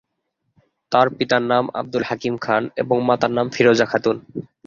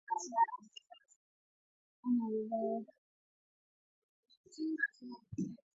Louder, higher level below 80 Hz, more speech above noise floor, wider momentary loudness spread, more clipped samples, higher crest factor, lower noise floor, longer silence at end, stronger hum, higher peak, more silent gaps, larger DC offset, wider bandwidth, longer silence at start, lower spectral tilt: first, -19 LUFS vs -38 LUFS; first, -60 dBFS vs -78 dBFS; first, 55 dB vs 20 dB; second, 8 LU vs 21 LU; neither; about the same, 18 dB vs 20 dB; first, -74 dBFS vs -56 dBFS; about the same, 0.2 s vs 0.2 s; neither; first, -2 dBFS vs -20 dBFS; second, none vs 1.16-2.03 s, 2.98-4.23 s, 4.37-4.44 s; neither; about the same, 7.4 kHz vs 7.6 kHz; first, 0.9 s vs 0.1 s; about the same, -5.5 dB/octave vs -4.5 dB/octave